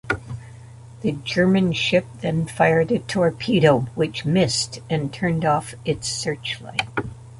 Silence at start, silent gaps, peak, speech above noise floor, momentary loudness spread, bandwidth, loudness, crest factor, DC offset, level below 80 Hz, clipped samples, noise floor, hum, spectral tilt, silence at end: 0.05 s; none; -2 dBFS; 20 dB; 10 LU; 11.5 kHz; -21 LUFS; 20 dB; under 0.1%; -48 dBFS; under 0.1%; -41 dBFS; none; -5 dB/octave; 0 s